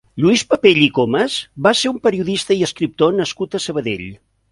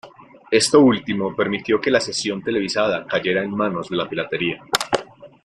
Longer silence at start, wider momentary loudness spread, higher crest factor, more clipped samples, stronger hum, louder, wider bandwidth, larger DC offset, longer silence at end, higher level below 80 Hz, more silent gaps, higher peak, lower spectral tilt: about the same, 0.15 s vs 0.05 s; about the same, 9 LU vs 9 LU; about the same, 16 dB vs 20 dB; neither; neither; first, -16 LUFS vs -20 LUFS; second, 11.5 kHz vs 14.5 kHz; neither; first, 0.35 s vs 0.15 s; about the same, -52 dBFS vs -56 dBFS; neither; about the same, 0 dBFS vs 0 dBFS; about the same, -4.5 dB/octave vs -4 dB/octave